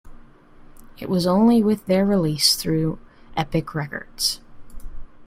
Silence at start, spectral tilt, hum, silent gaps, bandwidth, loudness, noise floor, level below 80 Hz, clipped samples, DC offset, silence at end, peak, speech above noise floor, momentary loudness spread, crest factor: 0.05 s; -4.5 dB/octave; none; none; 16 kHz; -21 LUFS; -46 dBFS; -42 dBFS; under 0.1%; under 0.1%; 0 s; -2 dBFS; 26 dB; 15 LU; 20 dB